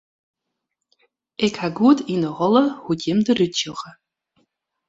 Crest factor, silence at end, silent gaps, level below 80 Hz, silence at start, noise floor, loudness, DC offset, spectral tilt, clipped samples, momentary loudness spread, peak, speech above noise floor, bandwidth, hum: 20 dB; 1 s; none; -62 dBFS; 1.4 s; -79 dBFS; -20 LUFS; under 0.1%; -5.5 dB/octave; under 0.1%; 13 LU; -2 dBFS; 60 dB; 7.8 kHz; none